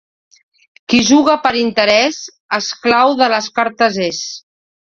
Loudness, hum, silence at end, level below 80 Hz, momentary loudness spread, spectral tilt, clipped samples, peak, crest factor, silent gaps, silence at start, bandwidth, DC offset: -14 LUFS; none; 0.5 s; -54 dBFS; 13 LU; -3 dB/octave; under 0.1%; 0 dBFS; 16 dB; 2.40-2.49 s; 0.9 s; 7.6 kHz; under 0.1%